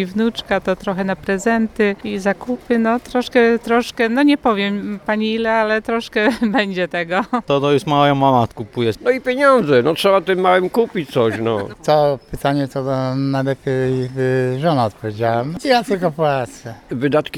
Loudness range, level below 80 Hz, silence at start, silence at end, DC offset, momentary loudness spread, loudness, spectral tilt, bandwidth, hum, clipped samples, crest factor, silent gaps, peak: 3 LU; -48 dBFS; 0 s; 0 s; under 0.1%; 7 LU; -17 LUFS; -6 dB/octave; 15.5 kHz; none; under 0.1%; 16 dB; none; 0 dBFS